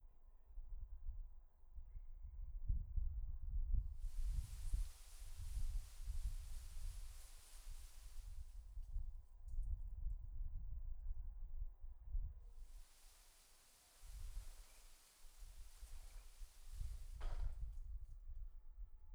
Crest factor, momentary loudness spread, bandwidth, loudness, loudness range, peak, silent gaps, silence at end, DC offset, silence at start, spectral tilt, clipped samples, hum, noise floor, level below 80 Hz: 18 dB; 15 LU; 14.5 kHz; -54 LUFS; 11 LU; -28 dBFS; none; 0 s; under 0.1%; 0 s; -4.5 dB/octave; under 0.1%; none; -68 dBFS; -48 dBFS